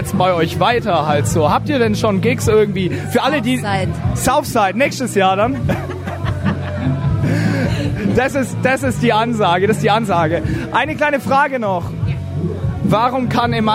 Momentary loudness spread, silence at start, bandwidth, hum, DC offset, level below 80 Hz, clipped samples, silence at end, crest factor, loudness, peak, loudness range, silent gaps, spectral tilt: 6 LU; 0 s; 16 kHz; none; under 0.1%; -36 dBFS; under 0.1%; 0 s; 14 dB; -16 LUFS; 0 dBFS; 2 LU; none; -6 dB/octave